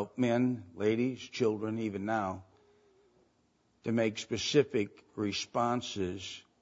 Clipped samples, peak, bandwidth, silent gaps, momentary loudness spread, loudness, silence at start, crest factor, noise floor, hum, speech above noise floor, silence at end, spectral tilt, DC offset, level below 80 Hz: under 0.1%; -14 dBFS; 8 kHz; none; 10 LU; -33 LUFS; 0 s; 20 dB; -72 dBFS; none; 40 dB; 0.2 s; -5 dB/octave; under 0.1%; -70 dBFS